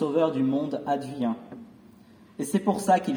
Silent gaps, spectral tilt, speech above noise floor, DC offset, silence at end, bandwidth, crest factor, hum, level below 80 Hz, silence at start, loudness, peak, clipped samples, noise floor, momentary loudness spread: none; -6 dB/octave; 27 dB; under 0.1%; 0 s; over 20 kHz; 18 dB; none; -70 dBFS; 0 s; -27 LUFS; -8 dBFS; under 0.1%; -53 dBFS; 19 LU